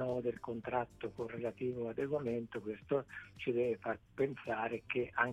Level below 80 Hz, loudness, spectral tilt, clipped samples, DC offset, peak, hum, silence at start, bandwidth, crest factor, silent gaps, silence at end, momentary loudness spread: -68 dBFS; -39 LUFS; -7.5 dB/octave; under 0.1%; under 0.1%; -16 dBFS; none; 0 s; 11 kHz; 22 dB; none; 0 s; 7 LU